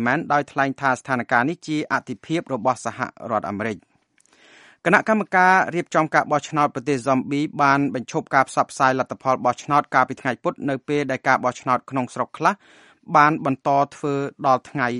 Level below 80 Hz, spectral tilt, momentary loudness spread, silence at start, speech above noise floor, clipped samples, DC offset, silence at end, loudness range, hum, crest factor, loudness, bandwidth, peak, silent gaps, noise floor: -66 dBFS; -5.5 dB/octave; 9 LU; 0 s; 38 dB; under 0.1%; under 0.1%; 0 s; 4 LU; none; 22 dB; -21 LUFS; 11.5 kHz; 0 dBFS; none; -60 dBFS